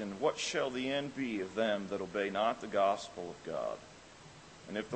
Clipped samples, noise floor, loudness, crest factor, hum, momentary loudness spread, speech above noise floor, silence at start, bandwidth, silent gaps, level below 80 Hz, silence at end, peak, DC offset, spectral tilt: under 0.1%; -55 dBFS; -35 LUFS; 18 dB; none; 21 LU; 20 dB; 0 s; 8.4 kHz; none; -70 dBFS; 0 s; -18 dBFS; under 0.1%; -4 dB/octave